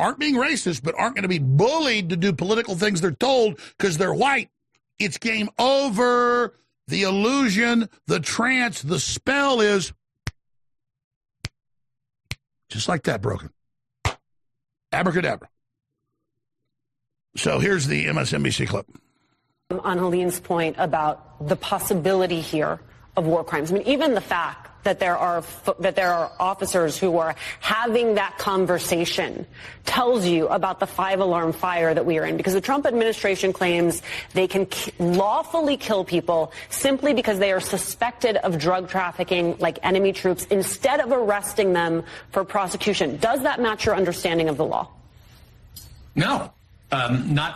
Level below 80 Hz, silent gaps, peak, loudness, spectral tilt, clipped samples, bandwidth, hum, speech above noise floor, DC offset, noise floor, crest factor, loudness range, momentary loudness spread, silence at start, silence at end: -52 dBFS; 11.04-11.21 s; -8 dBFS; -22 LUFS; -4.5 dB/octave; under 0.1%; 13 kHz; none; 60 dB; under 0.1%; -82 dBFS; 16 dB; 6 LU; 8 LU; 0 s; 0 s